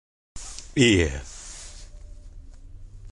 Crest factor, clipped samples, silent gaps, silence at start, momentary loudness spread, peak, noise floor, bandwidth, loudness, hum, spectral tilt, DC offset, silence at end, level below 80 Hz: 22 dB; under 0.1%; none; 0.35 s; 23 LU; -4 dBFS; -42 dBFS; 11.5 kHz; -22 LUFS; none; -4.5 dB/octave; under 0.1%; 0 s; -40 dBFS